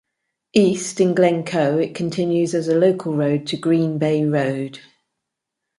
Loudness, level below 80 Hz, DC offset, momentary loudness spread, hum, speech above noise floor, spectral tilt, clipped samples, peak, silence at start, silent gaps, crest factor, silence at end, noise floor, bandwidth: -19 LUFS; -64 dBFS; under 0.1%; 5 LU; none; 63 dB; -6 dB/octave; under 0.1%; -4 dBFS; 0.55 s; none; 16 dB; 1 s; -81 dBFS; 11.5 kHz